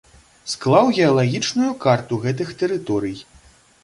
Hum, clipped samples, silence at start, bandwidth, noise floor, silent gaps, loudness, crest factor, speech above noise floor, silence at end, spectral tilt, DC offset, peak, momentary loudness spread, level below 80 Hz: none; under 0.1%; 0.45 s; 11.5 kHz; -51 dBFS; none; -19 LUFS; 18 dB; 32 dB; 0.6 s; -5.5 dB/octave; under 0.1%; -2 dBFS; 14 LU; -56 dBFS